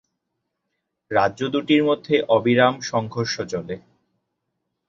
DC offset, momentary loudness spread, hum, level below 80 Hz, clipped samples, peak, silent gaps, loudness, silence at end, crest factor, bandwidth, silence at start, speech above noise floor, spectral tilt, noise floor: under 0.1%; 11 LU; none; -60 dBFS; under 0.1%; -4 dBFS; none; -21 LUFS; 1.1 s; 20 dB; 7.6 kHz; 1.1 s; 58 dB; -5.5 dB/octave; -78 dBFS